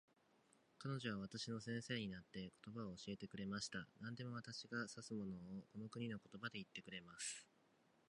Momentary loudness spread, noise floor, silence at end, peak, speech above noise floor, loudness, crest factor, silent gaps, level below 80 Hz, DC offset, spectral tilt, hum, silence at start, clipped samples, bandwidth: 7 LU; -77 dBFS; 0.65 s; -30 dBFS; 27 dB; -50 LUFS; 20 dB; none; -78 dBFS; under 0.1%; -4.5 dB/octave; none; 0.8 s; under 0.1%; 11 kHz